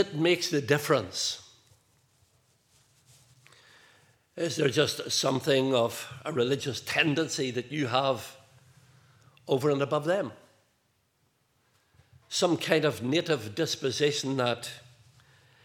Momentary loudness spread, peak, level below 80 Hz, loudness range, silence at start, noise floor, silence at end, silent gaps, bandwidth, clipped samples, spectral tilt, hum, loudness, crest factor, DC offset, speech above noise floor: 10 LU; -6 dBFS; -78 dBFS; 6 LU; 0 s; -72 dBFS; 0.85 s; none; 18 kHz; under 0.1%; -4 dB/octave; none; -28 LUFS; 24 dB; under 0.1%; 44 dB